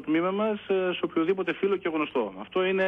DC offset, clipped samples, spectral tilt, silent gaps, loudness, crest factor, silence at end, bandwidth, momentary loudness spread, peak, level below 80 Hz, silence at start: under 0.1%; under 0.1%; -8 dB/octave; none; -27 LUFS; 12 dB; 0 s; 3.8 kHz; 3 LU; -14 dBFS; -68 dBFS; 0 s